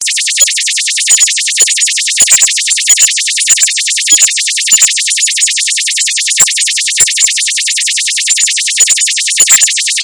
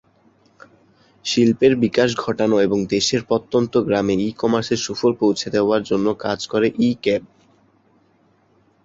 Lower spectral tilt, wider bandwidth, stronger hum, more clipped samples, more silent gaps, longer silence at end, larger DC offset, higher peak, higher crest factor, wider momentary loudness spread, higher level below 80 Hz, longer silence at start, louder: second, 4 dB/octave vs -5 dB/octave; first, 12 kHz vs 7.8 kHz; neither; first, 3% vs under 0.1%; neither; second, 0 s vs 1.6 s; neither; about the same, 0 dBFS vs -2 dBFS; second, 10 dB vs 18 dB; about the same, 5 LU vs 6 LU; about the same, -52 dBFS vs -54 dBFS; second, 0 s vs 1.25 s; first, -6 LUFS vs -19 LUFS